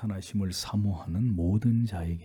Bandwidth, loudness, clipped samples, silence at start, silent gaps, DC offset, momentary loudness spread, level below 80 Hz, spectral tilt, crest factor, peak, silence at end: 18 kHz; -29 LUFS; under 0.1%; 0 s; none; under 0.1%; 6 LU; -50 dBFS; -6.5 dB/octave; 14 dB; -14 dBFS; 0 s